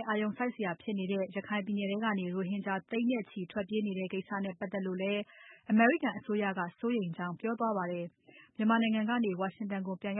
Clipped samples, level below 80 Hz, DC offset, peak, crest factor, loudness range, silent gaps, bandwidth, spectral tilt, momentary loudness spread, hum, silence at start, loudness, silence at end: under 0.1%; -80 dBFS; under 0.1%; -14 dBFS; 20 dB; 3 LU; none; 3.8 kHz; -3 dB/octave; 9 LU; none; 0 s; -33 LUFS; 0 s